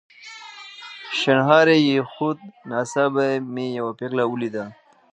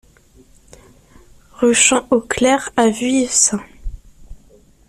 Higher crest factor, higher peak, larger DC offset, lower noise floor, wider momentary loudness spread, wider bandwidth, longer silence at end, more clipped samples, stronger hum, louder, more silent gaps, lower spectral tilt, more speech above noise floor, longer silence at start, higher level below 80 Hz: about the same, 20 dB vs 18 dB; about the same, -2 dBFS vs 0 dBFS; neither; second, -41 dBFS vs -49 dBFS; first, 22 LU vs 19 LU; second, 9.6 kHz vs 13.5 kHz; about the same, 0.4 s vs 0.5 s; neither; neither; second, -21 LUFS vs -15 LUFS; neither; first, -5.5 dB/octave vs -2 dB/octave; second, 21 dB vs 34 dB; second, 0.2 s vs 1.6 s; second, -74 dBFS vs -40 dBFS